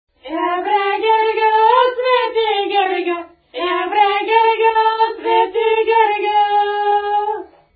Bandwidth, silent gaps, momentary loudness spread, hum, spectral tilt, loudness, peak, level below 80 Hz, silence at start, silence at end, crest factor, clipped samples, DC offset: 4.9 kHz; none; 9 LU; none; -7 dB/octave; -15 LUFS; -2 dBFS; -60 dBFS; 0.25 s; 0.3 s; 14 dB; under 0.1%; under 0.1%